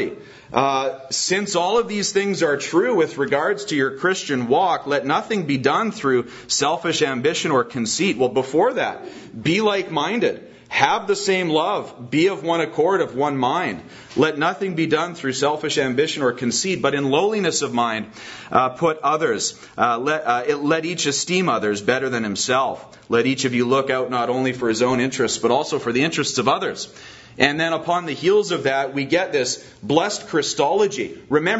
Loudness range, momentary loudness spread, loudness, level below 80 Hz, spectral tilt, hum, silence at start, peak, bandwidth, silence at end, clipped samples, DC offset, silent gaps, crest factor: 1 LU; 5 LU; -20 LUFS; -60 dBFS; -3.5 dB/octave; none; 0 s; 0 dBFS; 8 kHz; 0 s; under 0.1%; under 0.1%; none; 20 dB